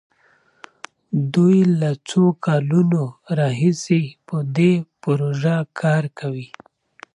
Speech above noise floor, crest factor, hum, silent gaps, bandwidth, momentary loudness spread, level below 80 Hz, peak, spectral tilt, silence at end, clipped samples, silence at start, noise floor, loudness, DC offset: 40 dB; 14 dB; none; none; 10.5 kHz; 11 LU; -66 dBFS; -6 dBFS; -7.5 dB/octave; 0.7 s; under 0.1%; 1.1 s; -59 dBFS; -19 LUFS; under 0.1%